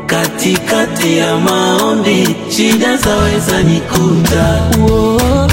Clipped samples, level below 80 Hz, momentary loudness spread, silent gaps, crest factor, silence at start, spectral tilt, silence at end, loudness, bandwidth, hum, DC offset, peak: under 0.1%; -24 dBFS; 3 LU; none; 10 dB; 0 s; -5 dB/octave; 0 s; -11 LUFS; 16.5 kHz; none; under 0.1%; 0 dBFS